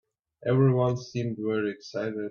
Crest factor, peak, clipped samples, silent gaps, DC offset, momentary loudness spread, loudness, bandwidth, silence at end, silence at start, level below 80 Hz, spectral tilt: 16 dB; -12 dBFS; under 0.1%; none; under 0.1%; 10 LU; -27 LUFS; 6.8 kHz; 0 s; 0.45 s; -64 dBFS; -8 dB/octave